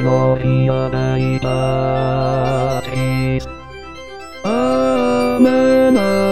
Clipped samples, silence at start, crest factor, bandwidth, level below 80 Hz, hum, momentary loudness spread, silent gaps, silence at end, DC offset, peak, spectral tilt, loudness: under 0.1%; 0 s; 16 dB; 13.5 kHz; -38 dBFS; none; 19 LU; none; 0 s; 2%; 0 dBFS; -7.5 dB/octave; -16 LUFS